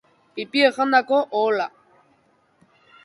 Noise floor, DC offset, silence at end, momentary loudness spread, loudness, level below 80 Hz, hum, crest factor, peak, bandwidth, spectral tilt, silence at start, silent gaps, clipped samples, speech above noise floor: -62 dBFS; under 0.1%; 1.35 s; 15 LU; -20 LUFS; -74 dBFS; none; 20 dB; -4 dBFS; 11.5 kHz; -4 dB/octave; 0.35 s; none; under 0.1%; 42 dB